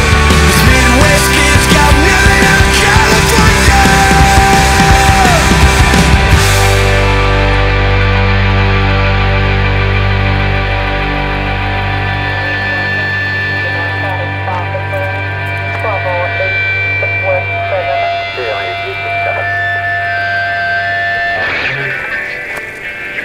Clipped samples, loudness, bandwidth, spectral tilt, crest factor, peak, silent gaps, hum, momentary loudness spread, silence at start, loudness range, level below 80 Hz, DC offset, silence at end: under 0.1%; -10 LUFS; 16.5 kHz; -4 dB/octave; 10 dB; 0 dBFS; none; none; 9 LU; 0 s; 7 LU; -18 dBFS; under 0.1%; 0 s